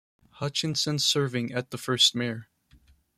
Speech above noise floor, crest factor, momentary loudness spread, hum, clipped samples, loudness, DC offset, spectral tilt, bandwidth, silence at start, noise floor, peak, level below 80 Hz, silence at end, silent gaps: 33 dB; 20 dB; 12 LU; none; under 0.1%; -25 LUFS; under 0.1%; -3 dB/octave; 15.5 kHz; 0.35 s; -60 dBFS; -8 dBFS; -66 dBFS; 0.75 s; none